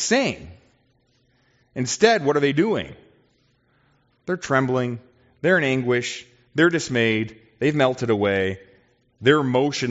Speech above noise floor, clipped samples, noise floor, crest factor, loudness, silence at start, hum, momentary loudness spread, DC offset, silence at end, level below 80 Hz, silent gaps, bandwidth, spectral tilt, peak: 43 dB; under 0.1%; -64 dBFS; 20 dB; -21 LUFS; 0 s; none; 14 LU; under 0.1%; 0 s; -60 dBFS; none; 8 kHz; -4 dB/octave; -2 dBFS